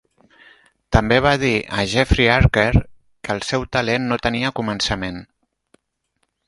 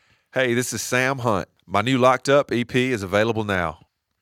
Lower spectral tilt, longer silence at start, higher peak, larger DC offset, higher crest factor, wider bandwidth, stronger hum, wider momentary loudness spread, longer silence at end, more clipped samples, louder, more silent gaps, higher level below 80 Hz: about the same, -5.5 dB/octave vs -4.5 dB/octave; first, 0.9 s vs 0.35 s; about the same, 0 dBFS vs -2 dBFS; neither; about the same, 20 dB vs 20 dB; second, 11.5 kHz vs 16.5 kHz; neither; first, 11 LU vs 7 LU; first, 1.25 s vs 0.45 s; neither; first, -18 LUFS vs -21 LUFS; neither; first, -30 dBFS vs -54 dBFS